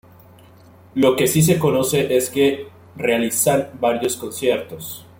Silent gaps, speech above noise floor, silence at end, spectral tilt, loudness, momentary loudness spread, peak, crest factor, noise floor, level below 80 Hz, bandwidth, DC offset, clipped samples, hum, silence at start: none; 28 dB; 0.2 s; -4.5 dB/octave; -19 LUFS; 13 LU; -2 dBFS; 16 dB; -47 dBFS; -54 dBFS; 17 kHz; under 0.1%; under 0.1%; none; 0.95 s